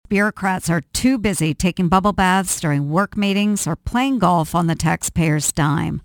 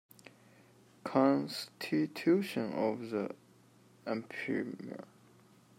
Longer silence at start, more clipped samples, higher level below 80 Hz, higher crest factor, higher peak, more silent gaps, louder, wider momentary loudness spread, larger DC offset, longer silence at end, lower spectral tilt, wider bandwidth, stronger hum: second, 0.1 s vs 1.05 s; neither; first, -38 dBFS vs -84 dBFS; about the same, 18 dB vs 22 dB; first, 0 dBFS vs -14 dBFS; neither; first, -18 LUFS vs -34 LUFS; second, 4 LU vs 17 LU; neither; second, 0.05 s vs 0.75 s; about the same, -5 dB/octave vs -6 dB/octave; first, 19 kHz vs 16 kHz; neither